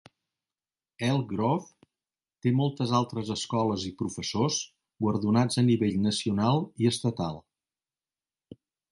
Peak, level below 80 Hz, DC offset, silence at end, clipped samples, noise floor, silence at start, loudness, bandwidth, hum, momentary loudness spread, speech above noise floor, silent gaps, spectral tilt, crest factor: -12 dBFS; -60 dBFS; under 0.1%; 0.35 s; under 0.1%; under -90 dBFS; 1 s; -28 LUFS; 11.5 kHz; none; 8 LU; over 63 dB; none; -5.5 dB/octave; 18 dB